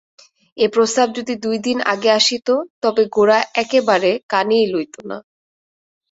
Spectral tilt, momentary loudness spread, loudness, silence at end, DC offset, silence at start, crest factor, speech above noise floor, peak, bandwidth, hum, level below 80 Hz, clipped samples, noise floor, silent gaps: -3 dB/octave; 9 LU; -17 LUFS; 0.9 s; under 0.1%; 0.55 s; 16 dB; over 73 dB; -2 dBFS; 8 kHz; none; -64 dBFS; under 0.1%; under -90 dBFS; 2.70-2.82 s, 4.23-4.29 s